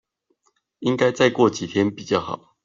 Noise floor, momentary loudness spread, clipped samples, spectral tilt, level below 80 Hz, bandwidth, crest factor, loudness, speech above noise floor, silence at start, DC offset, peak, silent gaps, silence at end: -69 dBFS; 8 LU; under 0.1%; -5.5 dB/octave; -62 dBFS; 7.6 kHz; 18 dB; -21 LUFS; 48 dB; 0.8 s; under 0.1%; -4 dBFS; none; 0.3 s